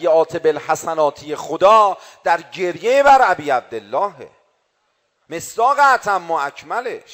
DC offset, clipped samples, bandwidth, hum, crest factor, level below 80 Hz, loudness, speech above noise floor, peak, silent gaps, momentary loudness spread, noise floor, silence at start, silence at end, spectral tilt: under 0.1%; under 0.1%; 16 kHz; none; 14 dB; -58 dBFS; -17 LUFS; 50 dB; -2 dBFS; none; 13 LU; -67 dBFS; 0 s; 0.15 s; -3.5 dB/octave